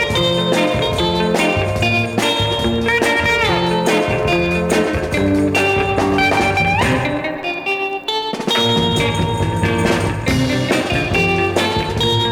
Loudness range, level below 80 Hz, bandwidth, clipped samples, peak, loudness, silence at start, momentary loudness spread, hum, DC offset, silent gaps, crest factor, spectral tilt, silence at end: 2 LU; -34 dBFS; 18 kHz; under 0.1%; -2 dBFS; -16 LUFS; 0 s; 4 LU; none; under 0.1%; none; 14 dB; -5 dB/octave; 0 s